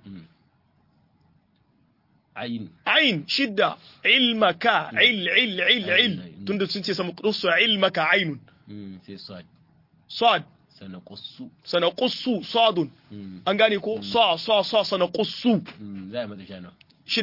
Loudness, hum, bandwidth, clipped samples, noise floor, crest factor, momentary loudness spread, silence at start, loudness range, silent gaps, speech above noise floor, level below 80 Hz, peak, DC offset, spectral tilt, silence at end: -22 LUFS; none; 5.8 kHz; under 0.1%; -64 dBFS; 20 dB; 22 LU; 0.05 s; 7 LU; none; 41 dB; -72 dBFS; -4 dBFS; under 0.1%; -5 dB/octave; 0 s